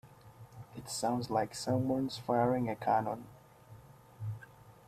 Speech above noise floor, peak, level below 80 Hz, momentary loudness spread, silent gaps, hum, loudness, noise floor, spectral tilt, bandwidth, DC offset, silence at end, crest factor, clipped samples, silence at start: 23 dB; -18 dBFS; -66 dBFS; 18 LU; none; none; -34 LUFS; -56 dBFS; -5.5 dB/octave; 15 kHz; under 0.1%; 0.15 s; 18 dB; under 0.1%; 0.05 s